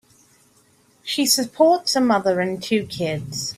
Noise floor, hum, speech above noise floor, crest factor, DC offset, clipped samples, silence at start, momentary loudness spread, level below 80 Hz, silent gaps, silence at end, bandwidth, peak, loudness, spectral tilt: -58 dBFS; none; 38 dB; 18 dB; under 0.1%; under 0.1%; 1.05 s; 10 LU; -60 dBFS; none; 0 s; 16 kHz; -4 dBFS; -20 LUFS; -3.5 dB/octave